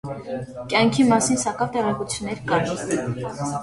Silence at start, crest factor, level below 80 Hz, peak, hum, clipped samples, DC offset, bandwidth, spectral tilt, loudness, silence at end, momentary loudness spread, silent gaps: 0.05 s; 18 dB; -52 dBFS; -6 dBFS; none; under 0.1%; under 0.1%; 11.5 kHz; -4.5 dB/octave; -22 LUFS; 0 s; 13 LU; none